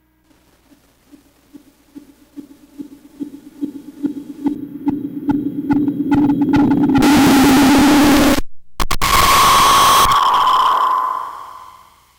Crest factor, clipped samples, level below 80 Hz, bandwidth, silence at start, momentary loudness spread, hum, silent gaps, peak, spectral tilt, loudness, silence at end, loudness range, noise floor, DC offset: 10 dB; under 0.1%; -34 dBFS; 19 kHz; 1.55 s; 19 LU; 60 Hz at -50 dBFS; none; -4 dBFS; -3.5 dB/octave; -13 LUFS; 0.5 s; 17 LU; -55 dBFS; under 0.1%